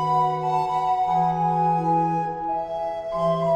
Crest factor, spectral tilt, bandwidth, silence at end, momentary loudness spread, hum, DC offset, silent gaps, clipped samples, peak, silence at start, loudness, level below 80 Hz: 12 dB; -7.5 dB/octave; 9.4 kHz; 0 s; 6 LU; none; under 0.1%; none; under 0.1%; -12 dBFS; 0 s; -23 LUFS; -54 dBFS